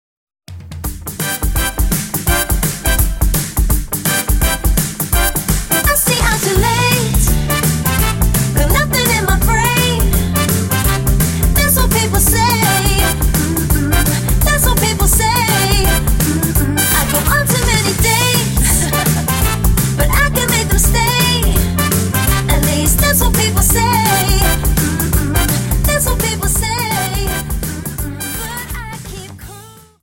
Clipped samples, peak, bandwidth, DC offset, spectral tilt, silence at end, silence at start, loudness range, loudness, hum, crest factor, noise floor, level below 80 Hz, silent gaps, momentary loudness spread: under 0.1%; 0 dBFS; 17 kHz; under 0.1%; -3.5 dB/octave; 0.3 s; 0.5 s; 4 LU; -13 LUFS; none; 14 dB; -37 dBFS; -18 dBFS; none; 8 LU